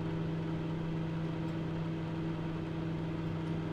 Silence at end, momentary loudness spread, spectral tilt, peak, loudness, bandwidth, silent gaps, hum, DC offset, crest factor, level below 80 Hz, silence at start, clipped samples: 0 s; 1 LU; -8.5 dB/octave; -26 dBFS; -37 LUFS; 7 kHz; none; none; under 0.1%; 10 dB; -54 dBFS; 0 s; under 0.1%